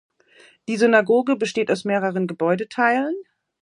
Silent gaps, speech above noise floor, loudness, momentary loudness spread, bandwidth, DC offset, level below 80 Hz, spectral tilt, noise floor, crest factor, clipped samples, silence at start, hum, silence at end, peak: none; 33 dB; -20 LUFS; 11 LU; 11 kHz; under 0.1%; -72 dBFS; -5.5 dB/octave; -53 dBFS; 20 dB; under 0.1%; 0.7 s; none; 0.4 s; -2 dBFS